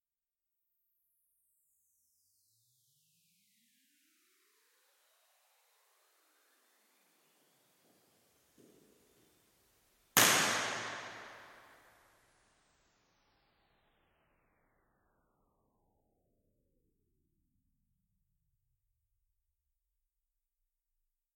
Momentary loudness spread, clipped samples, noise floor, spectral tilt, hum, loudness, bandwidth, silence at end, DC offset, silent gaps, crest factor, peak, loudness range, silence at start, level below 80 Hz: 24 LU; under 0.1%; under -90 dBFS; -0.5 dB/octave; none; -29 LUFS; 16.5 kHz; 9.9 s; under 0.1%; none; 38 dB; -6 dBFS; 13 LU; 10.15 s; -82 dBFS